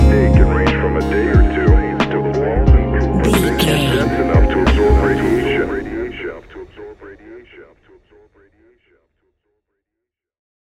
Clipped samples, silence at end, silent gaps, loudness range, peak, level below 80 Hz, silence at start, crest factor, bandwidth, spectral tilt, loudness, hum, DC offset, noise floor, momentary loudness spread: under 0.1%; 3.05 s; none; 14 LU; 0 dBFS; -20 dBFS; 0 s; 16 dB; 14 kHz; -6.5 dB/octave; -15 LUFS; none; under 0.1%; -81 dBFS; 16 LU